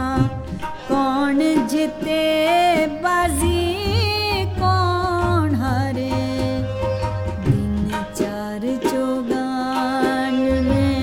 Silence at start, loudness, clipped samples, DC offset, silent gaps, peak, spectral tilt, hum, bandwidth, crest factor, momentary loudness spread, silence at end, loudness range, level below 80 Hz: 0 s; -20 LUFS; under 0.1%; under 0.1%; none; -4 dBFS; -6 dB/octave; none; 17.5 kHz; 14 dB; 6 LU; 0 s; 4 LU; -34 dBFS